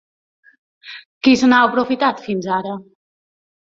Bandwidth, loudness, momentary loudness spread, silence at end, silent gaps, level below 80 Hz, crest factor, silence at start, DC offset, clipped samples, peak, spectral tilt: 7.6 kHz; -16 LUFS; 23 LU; 0.95 s; 1.05-1.21 s; -60 dBFS; 18 dB; 0.85 s; under 0.1%; under 0.1%; -2 dBFS; -4.5 dB/octave